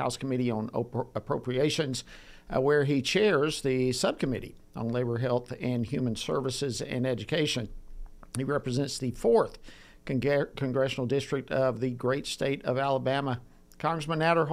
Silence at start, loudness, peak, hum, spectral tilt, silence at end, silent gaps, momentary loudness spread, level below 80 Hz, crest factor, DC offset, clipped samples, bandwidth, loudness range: 0 s; -29 LUFS; -12 dBFS; none; -5.5 dB/octave; 0 s; none; 9 LU; -52 dBFS; 18 dB; under 0.1%; under 0.1%; 15 kHz; 4 LU